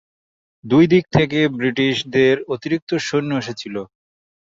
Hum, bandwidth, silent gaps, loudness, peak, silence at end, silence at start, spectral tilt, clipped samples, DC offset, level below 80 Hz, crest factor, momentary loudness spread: none; 7.8 kHz; 2.82-2.87 s; -18 LUFS; 0 dBFS; 0.55 s; 0.65 s; -6 dB/octave; under 0.1%; under 0.1%; -52 dBFS; 18 dB; 12 LU